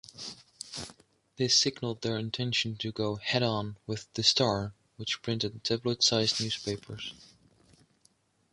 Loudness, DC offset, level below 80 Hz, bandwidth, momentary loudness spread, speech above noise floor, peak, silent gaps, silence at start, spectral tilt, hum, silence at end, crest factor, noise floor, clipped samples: -29 LUFS; under 0.1%; -62 dBFS; 11.5 kHz; 17 LU; 38 dB; -10 dBFS; none; 0.15 s; -3.5 dB/octave; none; 1.3 s; 22 dB; -68 dBFS; under 0.1%